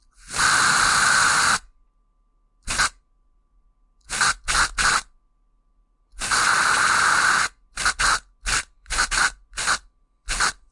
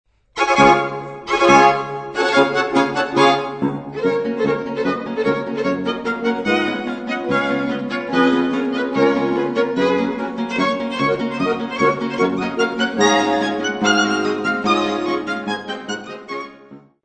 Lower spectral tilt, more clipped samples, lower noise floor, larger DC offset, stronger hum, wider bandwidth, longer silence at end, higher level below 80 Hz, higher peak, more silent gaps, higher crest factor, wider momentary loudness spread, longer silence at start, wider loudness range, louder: second, 0.5 dB/octave vs -4.5 dB/octave; neither; first, -63 dBFS vs -43 dBFS; neither; neither; first, 11.5 kHz vs 9 kHz; about the same, 0.2 s vs 0.25 s; first, -40 dBFS vs -54 dBFS; second, -6 dBFS vs 0 dBFS; neither; about the same, 18 dB vs 18 dB; about the same, 10 LU vs 9 LU; about the same, 0.25 s vs 0.35 s; about the same, 5 LU vs 4 LU; about the same, -20 LUFS vs -18 LUFS